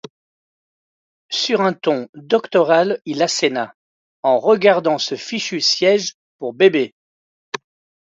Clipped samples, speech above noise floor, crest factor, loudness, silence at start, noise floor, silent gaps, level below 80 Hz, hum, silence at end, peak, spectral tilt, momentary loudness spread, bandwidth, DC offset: under 0.1%; over 73 dB; 18 dB; -17 LUFS; 1.3 s; under -90 dBFS; 2.09-2.13 s, 3.74-4.23 s, 6.14-6.39 s, 6.92-7.52 s; -70 dBFS; none; 0.45 s; 0 dBFS; -3.5 dB/octave; 16 LU; 7.8 kHz; under 0.1%